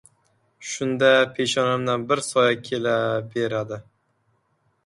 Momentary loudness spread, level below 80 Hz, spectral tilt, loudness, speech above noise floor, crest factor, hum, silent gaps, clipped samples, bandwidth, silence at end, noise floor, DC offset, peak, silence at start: 14 LU; -66 dBFS; -4 dB/octave; -22 LUFS; 46 dB; 20 dB; none; none; under 0.1%; 11.5 kHz; 1.05 s; -68 dBFS; under 0.1%; -4 dBFS; 0.6 s